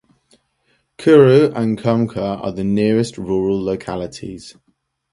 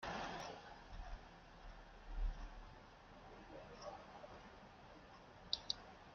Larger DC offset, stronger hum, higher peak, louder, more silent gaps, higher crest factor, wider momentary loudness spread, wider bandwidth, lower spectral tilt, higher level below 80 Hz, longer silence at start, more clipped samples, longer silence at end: neither; neither; first, 0 dBFS vs -20 dBFS; first, -16 LUFS vs -52 LUFS; neither; second, 18 dB vs 30 dB; about the same, 17 LU vs 15 LU; first, 11.5 kHz vs 7 kHz; first, -7.5 dB/octave vs -2 dB/octave; first, -48 dBFS vs -54 dBFS; first, 1 s vs 0 s; neither; first, 0.6 s vs 0 s